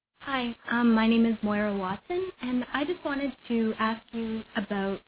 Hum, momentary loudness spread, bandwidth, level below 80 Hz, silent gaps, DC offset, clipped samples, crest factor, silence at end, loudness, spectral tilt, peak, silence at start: none; 10 LU; 4 kHz; -58 dBFS; none; under 0.1%; under 0.1%; 14 dB; 0.1 s; -28 LUFS; -4 dB/octave; -14 dBFS; 0.2 s